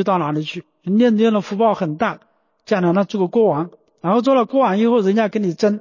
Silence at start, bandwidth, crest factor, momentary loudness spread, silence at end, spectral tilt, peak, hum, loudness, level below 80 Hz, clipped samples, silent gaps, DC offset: 0 s; 7.4 kHz; 12 dB; 9 LU; 0 s; -7.5 dB/octave; -6 dBFS; none; -18 LUFS; -66 dBFS; under 0.1%; none; under 0.1%